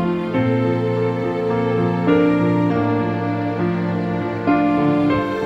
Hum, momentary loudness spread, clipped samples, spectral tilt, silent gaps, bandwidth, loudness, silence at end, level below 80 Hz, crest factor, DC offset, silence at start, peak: none; 5 LU; under 0.1%; -9 dB/octave; none; 7.4 kHz; -19 LUFS; 0 s; -48 dBFS; 14 dB; under 0.1%; 0 s; -4 dBFS